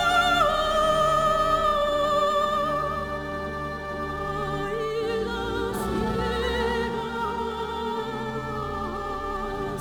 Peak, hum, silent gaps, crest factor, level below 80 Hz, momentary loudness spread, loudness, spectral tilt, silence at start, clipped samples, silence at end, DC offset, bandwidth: -10 dBFS; none; none; 16 dB; -40 dBFS; 10 LU; -26 LUFS; -4.5 dB/octave; 0 s; under 0.1%; 0 s; 0.1%; 19 kHz